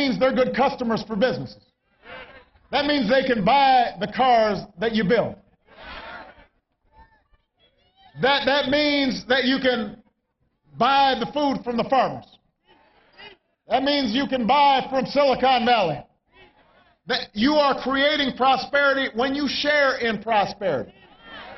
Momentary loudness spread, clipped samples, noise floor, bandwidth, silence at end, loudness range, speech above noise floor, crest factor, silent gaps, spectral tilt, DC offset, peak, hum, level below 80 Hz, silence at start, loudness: 17 LU; under 0.1%; -71 dBFS; 6.2 kHz; 0 s; 5 LU; 51 dB; 16 dB; none; -5.5 dB/octave; under 0.1%; -8 dBFS; none; -54 dBFS; 0 s; -21 LUFS